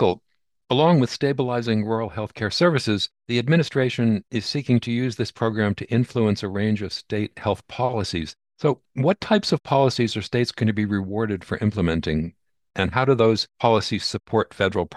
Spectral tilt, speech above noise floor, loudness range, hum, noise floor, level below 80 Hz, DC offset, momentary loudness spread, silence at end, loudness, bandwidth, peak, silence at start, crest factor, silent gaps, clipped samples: -6.5 dB/octave; 33 dB; 2 LU; none; -55 dBFS; -50 dBFS; under 0.1%; 7 LU; 0 s; -23 LUFS; 12 kHz; -4 dBFS; 0 s; 18 dB; none; under 0.1%